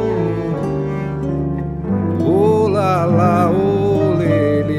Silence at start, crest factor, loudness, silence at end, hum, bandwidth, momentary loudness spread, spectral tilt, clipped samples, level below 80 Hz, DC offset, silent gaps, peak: 0 s; 14 dB; -16 LUFS; 0 s; none; 12.5 kHz; 7 LU; -9 dB/octave; under 0.1%; -38 dBFS; under 0.1%; none; -2 dBFS